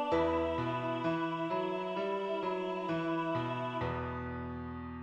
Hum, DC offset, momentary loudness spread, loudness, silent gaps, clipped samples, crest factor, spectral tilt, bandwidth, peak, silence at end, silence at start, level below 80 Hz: none; under 0.1%; 8 LU; -35 LUFS; none; under 0.1%; 16 dB; -7.5 dB/octave; 8 kHz; -20 dBFS; 0 s; 0 s; -56 dBFS